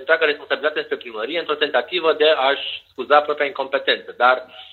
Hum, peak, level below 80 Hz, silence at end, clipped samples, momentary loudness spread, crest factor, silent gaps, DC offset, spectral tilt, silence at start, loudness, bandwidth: none; 0 dBFS; -72 dBFS; 0.05 s; under 0.1%; 9 LU; 18 dB; none; under 0.1%; -4.5 dB/octave; 0 s; -19 LUFS; 4.5 kHz